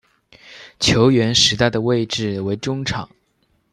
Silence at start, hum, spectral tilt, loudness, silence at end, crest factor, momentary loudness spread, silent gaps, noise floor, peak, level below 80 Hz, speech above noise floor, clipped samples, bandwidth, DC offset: 0.45 s; none; -4 dB/octave; -17 LUFS; 0.65 s; 18 dB; 11 LU; none; -64 dBFS; -2 dBFS; -46 dBFS; 46 dB; under 0.1%; 12.5 kHz; under 0.1%